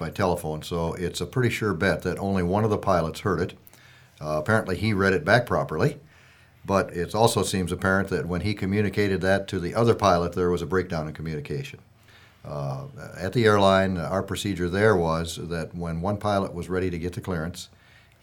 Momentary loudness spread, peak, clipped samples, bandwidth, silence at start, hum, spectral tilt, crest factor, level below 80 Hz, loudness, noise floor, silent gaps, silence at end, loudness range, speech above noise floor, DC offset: 12 LU; -2 dBFS; under 0.1%; 19.5 kHz; 0 s; none; -6 dB/octave; 22 dB; -48 dBFS; -25 LUFS; -54 dBFS; none; 0.55 s; 3 LU; 30 dB; under 0.1%